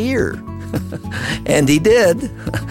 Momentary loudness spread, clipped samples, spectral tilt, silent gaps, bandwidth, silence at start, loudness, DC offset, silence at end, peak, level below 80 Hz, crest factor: 13 LU; under 0.1%; -5 dB/octave; none; 16.5 kHz; 0 s; -17 LUFS; under 0.1%; 0 s; -2 dBFS; -36 dBFS; 14 dB